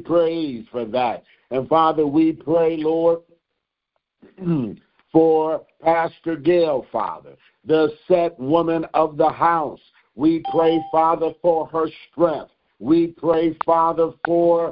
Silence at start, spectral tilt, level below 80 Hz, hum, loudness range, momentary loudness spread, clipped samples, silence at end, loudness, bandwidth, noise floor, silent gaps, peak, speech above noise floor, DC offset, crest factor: 0 s; -11.5 dB/octave; -56 dBFS; none; 2 LU; 10 LU; under 0.1%; 0 s; -20 LUFS; 5.2 kHz; -79 dBFS; none; -4 dBFS; 60 dB; under 0.1%; 16 dB